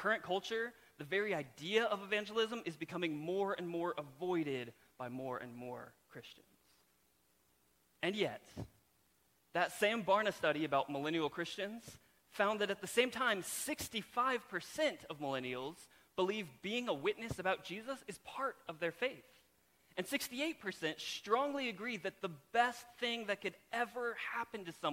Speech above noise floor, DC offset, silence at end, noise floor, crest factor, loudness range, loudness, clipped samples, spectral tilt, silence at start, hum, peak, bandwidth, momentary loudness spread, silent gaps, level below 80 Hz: 36 dB; under 0.1%; 0 s; -75 dBFS; 22 dB; 8 LU; -39 LUFS; under 0.1%; -3.5 dB/octave; 0 s; none; -18 dBFS; 16.5 kHz; 13 LU; none; -74 dBFS